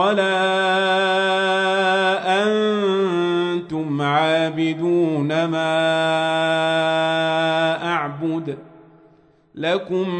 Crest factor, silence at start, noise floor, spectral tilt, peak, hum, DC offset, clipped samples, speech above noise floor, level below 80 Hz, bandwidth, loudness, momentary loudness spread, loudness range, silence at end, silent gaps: 14 dB; 0 s; -54 dBFS; -5.5 dB/octave; -6 dBFS; none; under 0.1%; under 0.1%; 35 dB; -66 dBFS; 9.4 kHz; -19 LUFS; 6 LU; 3 LU; 0 s; none